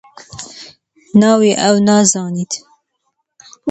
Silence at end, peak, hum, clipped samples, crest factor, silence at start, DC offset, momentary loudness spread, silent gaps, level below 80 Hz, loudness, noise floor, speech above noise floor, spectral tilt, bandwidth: 0 s; 0 dBFS; none; under 0.1%; 16 dB; 0.35 s; under 0.1%; 21 LU; none; -58 dBFS; -13 LUFS; -69 dBFS; 58 dB; -4.5 dB/octave; 9 kHz